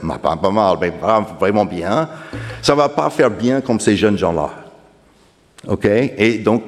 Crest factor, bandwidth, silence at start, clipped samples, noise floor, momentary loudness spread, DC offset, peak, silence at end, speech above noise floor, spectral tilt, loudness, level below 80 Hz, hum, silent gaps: 16 dB; 13.5 kHz; 0 s; under 0.1%; -52 dBFS; 9 LU; under 0.1%; 0 dBFS; 0 s; 36 dB; -5.5 dB/octave; -16 LUFS; -44 dBFS; none; none